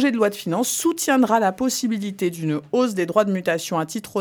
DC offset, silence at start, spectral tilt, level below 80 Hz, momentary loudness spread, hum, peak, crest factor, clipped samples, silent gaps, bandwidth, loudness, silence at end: under 0.1%; 0 s; -4.5 dB/octave; -66 dBFS; 6 LU; none; -4 dBFS; 18 dB; under 0.1%; none; 19 kHz; -21 LUFS; 0 s